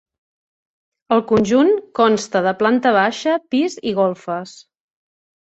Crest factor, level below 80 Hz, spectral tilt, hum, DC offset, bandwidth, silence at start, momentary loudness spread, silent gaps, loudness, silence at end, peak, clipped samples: 16 dB; -58 dBFS; -5 dB/octave; none; under 0.1%; 8.2 kHz; 1.1 s; 8 LU; none; -17 LUFS; 1.05 s; -2 dBFS; under 0.1%